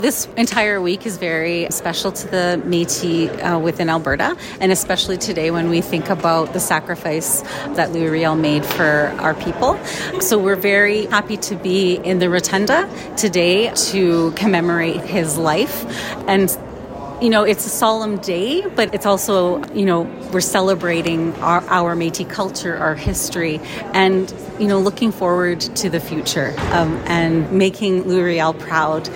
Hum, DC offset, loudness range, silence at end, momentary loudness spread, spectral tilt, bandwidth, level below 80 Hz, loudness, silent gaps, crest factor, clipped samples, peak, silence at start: none; under 0.1%; 2 LU; 0 s; 6 LU; -4 dB/octave; 16.5 kHz; -44 dBFS; -18 LUFS; none; 18 dB; under 0.1%; 0 dBFS; 0 s